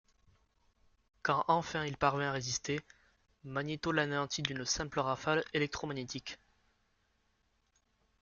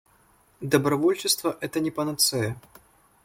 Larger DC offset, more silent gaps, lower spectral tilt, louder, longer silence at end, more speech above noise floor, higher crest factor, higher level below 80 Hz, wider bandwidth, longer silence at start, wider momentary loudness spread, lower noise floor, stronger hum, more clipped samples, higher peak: neither; neither; about the same, -4 dB/octave vs -3.5 dB/octave; second, -35 LUFS vs -24 LUFS; first, 1.85 s vs 0.65 s; first, 41 dB vs 36 dB; about the same, 24 dB vs 20 dB; about the same, -64 dBFS vs -62 dBFS; second, 7.4 kHz vs 17 kHz; first, 1.25 s vs 0.6 s; about the same, 10 LU vs 9 LU; first, -76 dBFS vs -61 dBFS; neither; neither; second, -12 dBFS vs -6 dBFS